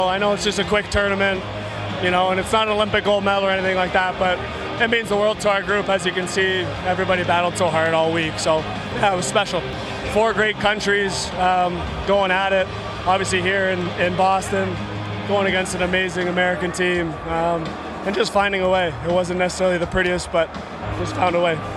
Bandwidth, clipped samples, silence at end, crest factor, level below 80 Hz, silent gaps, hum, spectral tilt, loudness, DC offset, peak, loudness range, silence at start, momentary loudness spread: 13 kHz; under 0.1%; 0 s; 18 dB; -40 dBFS; none; none; -4.5 dB/octave; -20 LUFS; under 0.1%; -2 dBFS; 1 LU; 0 s; 7 LU